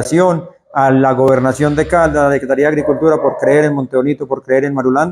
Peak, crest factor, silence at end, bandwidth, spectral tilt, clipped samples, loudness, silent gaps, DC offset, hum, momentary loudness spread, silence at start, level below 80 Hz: 0 dBFS; 12 dB; 0 s; 12.5 kHz; -7 dB/octave; under 0.1%; -13 LUFS; none; under 0.1%; none; 5 LU; 0 s; -40 dBFS